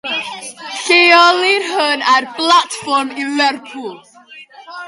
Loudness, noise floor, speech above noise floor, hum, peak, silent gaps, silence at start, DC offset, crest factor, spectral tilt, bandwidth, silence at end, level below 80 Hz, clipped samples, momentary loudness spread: -12 LUFS; -39 dBFS; 24 dB; none; 0 dBFS; none; 0.05 s; under 0.1%; 16 dB; -1 dB/octave; 11.5 kHz; 0 s; -70 dBFS; under 0.1%; 20 LU